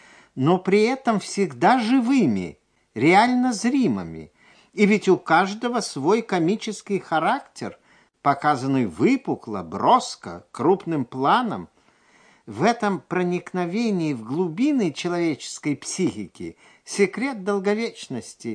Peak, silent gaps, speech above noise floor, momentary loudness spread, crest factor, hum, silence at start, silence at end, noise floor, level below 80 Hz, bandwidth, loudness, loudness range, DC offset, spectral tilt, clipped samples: -4 dBFS; none; 36 dB; 15 LU; 18 dB; none; 0.35 s; 0 s; -58 dBFS; -64 dBFS; 10.5 kHz; -22 LUFS; 5 LU; under 0.1%; -5.5 dB/octave; under 0.1%